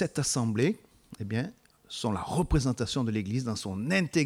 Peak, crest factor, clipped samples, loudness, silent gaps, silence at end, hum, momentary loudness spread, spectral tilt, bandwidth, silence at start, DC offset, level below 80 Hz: -12 dBFS; 16 dB; under 0.1%; -30 LUFS; none; 0 s; none; 9 LU; -5 dB/octave; 16 kHz; 0 s; under 0.1%; -44 dBFS